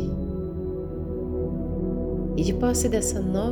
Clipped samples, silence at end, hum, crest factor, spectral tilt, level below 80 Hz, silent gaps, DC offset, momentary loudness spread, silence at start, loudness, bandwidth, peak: under 0.1%; 0 s; none; 16 dB; -6 dB/octave; -34 dBFS; none; under 0.1%; 8 LU; 0 s; -27 LUFS; 18 kHz; -10 dBFS